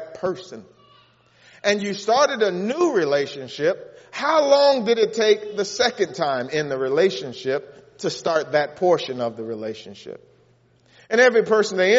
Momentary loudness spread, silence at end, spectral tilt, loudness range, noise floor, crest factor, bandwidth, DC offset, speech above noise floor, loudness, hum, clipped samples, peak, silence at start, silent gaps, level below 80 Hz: 14 LU; 0 s; -2.5 dB/octave; 5 LU; -58 dBFS; 18 dB; 8 kHz; under 0.1%; 37 dB; -21 LUFS; none; under 0.1%; -4 dBFS; 0 s; none; -68 dBFS